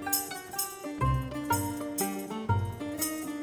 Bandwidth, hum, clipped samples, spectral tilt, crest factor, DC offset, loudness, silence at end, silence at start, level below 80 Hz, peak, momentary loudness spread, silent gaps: over 20 kHz; none; under 0.1%; -4.5 dB/octave; 20 dB; under 0.1%; -32 LUFS; 0 s; 0 s; -46 dBFS; -12 dBFS; 5 LU; none